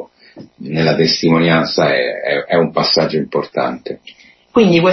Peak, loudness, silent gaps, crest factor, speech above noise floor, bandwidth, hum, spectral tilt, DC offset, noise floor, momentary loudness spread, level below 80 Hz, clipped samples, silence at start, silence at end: 0 dBFS; -14 LUFS; none; 14 dB; 26 dB; 6.2 kHz; none; -5.5 dB/octave; under 0.1%; -40 dBFS; 11 LU; -52 dBFS; under 0.1%; 0 s; 0 s